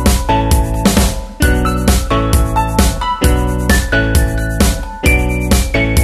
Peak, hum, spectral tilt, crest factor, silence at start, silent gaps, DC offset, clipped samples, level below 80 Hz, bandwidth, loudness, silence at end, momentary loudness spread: 0 dBFS; none; -5 dB/octave; 12 dB; 0 s; none; under 0.1%; under 0.1%; -16 dBFS; 13.5 kHz; -14 LUFS; 0 s; 3 LU